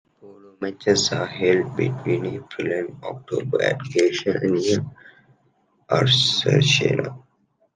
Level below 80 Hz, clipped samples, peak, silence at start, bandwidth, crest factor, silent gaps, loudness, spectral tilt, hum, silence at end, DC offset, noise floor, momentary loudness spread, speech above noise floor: -62 dBFS; under 0.1%; -2 dBFS; 0.25 s; 9.6 kHz; 20 dB; none; -21 LUFS; -4.5 dB/octave; none; 0.6 s; under 0.1%; -65 dBFS; 14 LU; 44 dB